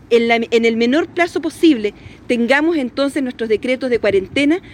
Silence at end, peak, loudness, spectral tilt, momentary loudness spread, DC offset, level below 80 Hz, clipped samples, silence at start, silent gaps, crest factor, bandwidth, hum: 0 s; 0 dBFS; -16 LUFS; -4.5 dB/octave; 5 LU; under 0.1%; -50 dBFS; under 0.1%; 0.1 s; none; 16 dB; 13 kHz; none